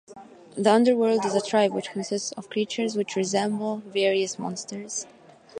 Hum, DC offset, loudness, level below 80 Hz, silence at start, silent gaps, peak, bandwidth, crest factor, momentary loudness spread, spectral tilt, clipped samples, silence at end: none; under 0.1%; -25 LUFS; -76 dBFS; 0.1 s; none; -6 dBFS; 11 kHz; 20 dB; 12 LU; -4 dB/octave; under 0.1%; 0 s